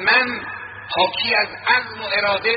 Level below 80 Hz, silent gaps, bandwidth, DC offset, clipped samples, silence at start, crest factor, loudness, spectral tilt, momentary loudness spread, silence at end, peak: -58 dBFS; none; 5.4 kHz; under 0.1%; under 0.1%; 0 s; 18 dB; -19 LUFS; 1 dB/octave; 11 LU; 0 s; -2 dBFS